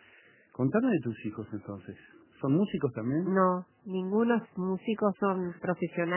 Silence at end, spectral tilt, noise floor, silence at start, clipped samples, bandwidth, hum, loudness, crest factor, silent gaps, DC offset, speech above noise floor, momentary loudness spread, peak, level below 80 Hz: 0 s; -7 dB/octave; -60 dBFS; 0.6 s; under 0.1%; 3.2 kHz; none; -30 LUFS; 18 dB; none; under 0.1%; 30 dB; 14 LU; -12 dBFS; -68 dBFS